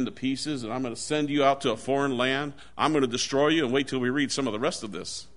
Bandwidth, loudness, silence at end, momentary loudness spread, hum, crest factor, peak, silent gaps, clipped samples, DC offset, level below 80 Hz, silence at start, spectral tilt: 11 kHz; -26 LUFS; 0.1 s; 8 LU; none; 18 dB; -8 dBFS; none; under 0.1%; 0.5%; -60 dBFS; 0 s; -4 dB/octave